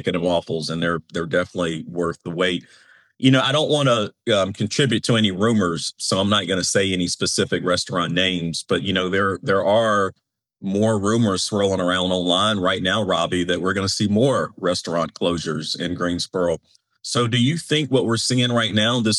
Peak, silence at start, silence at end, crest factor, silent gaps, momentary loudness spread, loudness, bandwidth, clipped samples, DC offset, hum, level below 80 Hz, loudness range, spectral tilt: -4 dBFS; 0 s; 0 s; 18 dB; none; 7 LU; -20 LUFS; 12 kHz; under 0.1%; under 0.1%; none; -56 dBFS; 3 LU; -4.5 dB/octave